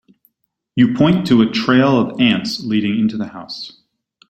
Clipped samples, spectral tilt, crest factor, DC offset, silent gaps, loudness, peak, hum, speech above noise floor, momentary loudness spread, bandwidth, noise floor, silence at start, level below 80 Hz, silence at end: under 0.1%; -6.5 dB/octave; 16 dB; under 0.1%; none; -15 LUFS; -2 dBFS; none; 54 dB; 15 LU; 13 kHz; -69 dBFS; 0.75 s; -52 dBFS; 0.6 s